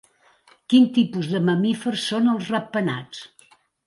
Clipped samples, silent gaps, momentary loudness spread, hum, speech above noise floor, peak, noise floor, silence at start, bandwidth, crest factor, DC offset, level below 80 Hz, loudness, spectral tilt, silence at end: under 0.1%; none; 11 LU; none; 36 dB; -6 dBFS; -57 dBFS; 0.7 s; 11.5 kHz; 16 dB; under 0.1%; -68 dBFS; -21 LUFS; -6 dB/octave; 0.6 s